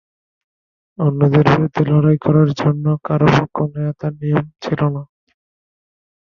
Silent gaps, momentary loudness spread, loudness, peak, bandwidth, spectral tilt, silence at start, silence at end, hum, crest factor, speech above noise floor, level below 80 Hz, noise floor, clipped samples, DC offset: none; 9 LU; -16 LUFS; 0 dBFS; 6.8 kHz; -8.5 dB/octave; 1 s; 1.3 s; none; 16 dB; over 75 dB; -48 dBFS; under -90 dBFS; under 0.1%; under 0.1%